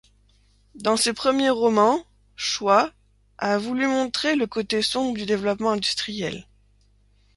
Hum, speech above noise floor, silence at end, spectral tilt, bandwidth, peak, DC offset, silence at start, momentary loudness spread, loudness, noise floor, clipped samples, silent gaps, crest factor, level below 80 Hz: 50 Hz at -50 dBFS; 37 dB; 0.95 s; -3.5 dB/octave; 11.5 kHz; -6 dBFS; under 0.1%; 0.75 s; 9 LU; -23 LUFS; -59 dBFS; under 0.1%; none; 18 dB; -58 dBFS